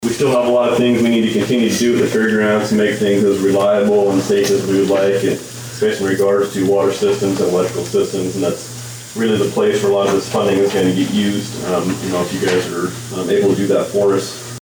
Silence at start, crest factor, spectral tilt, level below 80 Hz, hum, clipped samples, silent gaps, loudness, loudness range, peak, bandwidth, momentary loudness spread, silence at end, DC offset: 0 s; 10 dB; -5 dB/octave; -54 dBFS; none; under 0.1%; none; -16 LUFS; 3 LU; -6 dBFS; over 20 kHz; 7 LU; 0 s; under 0.1%